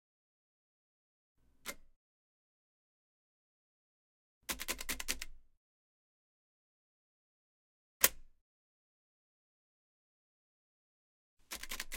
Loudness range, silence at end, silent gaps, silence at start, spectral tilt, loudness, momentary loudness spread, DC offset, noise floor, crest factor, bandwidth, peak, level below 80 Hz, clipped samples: 17 LU; 0 s; 1.96-4.41 s, 5.57-8.00 s, 8.41-11.37 s; 1.65 s; 0 dB/octave; -36 LUFS; 19 LU; under 0.1%; under -90 dBFS; 40 dB; 16.5 kHz; -6 dBFS; -60 dBFS; under 0.1%